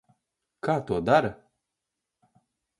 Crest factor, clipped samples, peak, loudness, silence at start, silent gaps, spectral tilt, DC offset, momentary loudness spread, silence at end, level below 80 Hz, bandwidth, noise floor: 22 dB; under 0.1%; -8 dBFS; -26 LUFS; 0.65 s; none; -7 dB/octave; under 0.1%; 12 LU; 1.45 s; -58 dBFS; 11.5 kHz; -85 dBFS